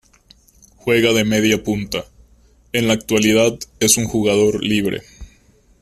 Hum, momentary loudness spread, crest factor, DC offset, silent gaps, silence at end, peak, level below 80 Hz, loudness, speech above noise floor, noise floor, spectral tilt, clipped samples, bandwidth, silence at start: none; 10 LU; 18 dB; under 0.1%; none; 0.55 s; 0 dBFS; -46 dBFS; -17 LUFS; 36 dB; -53 dBFS; -3.5 dB/octave; under 0.1%; 15.5 kHz; 0.85 s